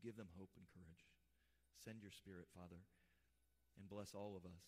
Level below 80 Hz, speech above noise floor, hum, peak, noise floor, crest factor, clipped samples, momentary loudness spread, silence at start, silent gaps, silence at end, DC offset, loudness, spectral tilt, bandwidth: -82 dBFS; 26 dB; none; -42 dBFS; -83 dBFS; 18 dB; under 0.1%; 12 LU; 0 s; none; 0 s; under 0.1%; -59 LUFS; -5.5 dB/octave; 15.5 kHz